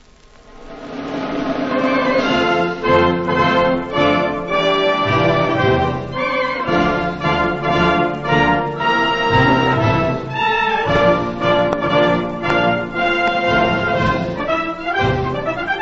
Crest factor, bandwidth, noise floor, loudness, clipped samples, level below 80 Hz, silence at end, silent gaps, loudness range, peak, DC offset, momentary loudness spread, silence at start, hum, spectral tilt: 16 dB; 7.8 kHz; -45 dBFS; -16 LUFS; under 0.1%; -38 dBFS; 0 s; none; 2 LU; 0 dBFS; under 0.1%; 6 LU; 0.5 s; none; -6.5 dB/octave